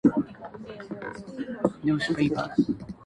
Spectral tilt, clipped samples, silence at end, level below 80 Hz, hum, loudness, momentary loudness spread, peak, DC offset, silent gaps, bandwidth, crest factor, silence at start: -7 dB/octave; under 0.1%; 0 s; -56 dBFS; none; -28 LUFS; 15 LU; -8 dBFS; under 0.1%; none; 10.5 kHz; 20 dB; 0.05 s